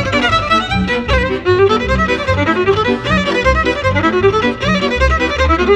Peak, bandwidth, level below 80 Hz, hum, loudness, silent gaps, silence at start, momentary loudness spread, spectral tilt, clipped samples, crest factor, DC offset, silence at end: -2 dBFS; 9.8 kHz; -24 dBFS; none; -13 LUFS; none; 0 s; 2 LU; -5.5 dB/octave; under 0.1%; 12 dB; under 0.1%; 0 s